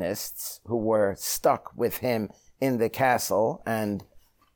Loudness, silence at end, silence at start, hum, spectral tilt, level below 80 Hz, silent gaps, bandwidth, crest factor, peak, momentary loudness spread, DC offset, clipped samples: -27 LUFS; 0.55 s; 0 s; none; -4.5 dB/octave; -60 dBFS; none; over 20 kHz; 18 dB; -10 dBFS; 8 LU; under 0.1%; under 0.1%